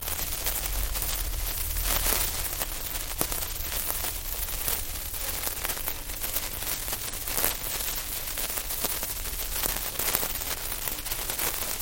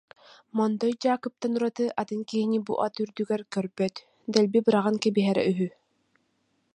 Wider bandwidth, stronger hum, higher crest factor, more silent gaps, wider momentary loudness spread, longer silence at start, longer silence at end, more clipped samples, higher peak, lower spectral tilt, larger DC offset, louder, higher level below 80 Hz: first, 17 kHz vs 10.5 kHz; neither; first, 30 dB vs 24 dB; neither; second, 5 LU vs 8 LU; second, 0 s vs 0.55 s; second, 0 s vs 1.05 s; neither; first, 0 dBFS vs -4 dBFS; second, -1.5 dB/octave vs -6 dB/octave; neither; about the same, -28 LUFS vs -27 LUFS; first, -38 dBFS vs -74 dBFS